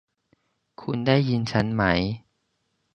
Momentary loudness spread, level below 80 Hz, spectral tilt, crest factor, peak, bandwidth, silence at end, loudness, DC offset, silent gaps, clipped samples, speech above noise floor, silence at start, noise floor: 12 LU; -48 dBFS; -7 dB/octave; 22 dB; -4 dBFS; 9.2 kHz; 0.75 s; -24 LUFS; under 0.1%; none; under 0.1%; 51 dB; 0.8 s; -74 dBFS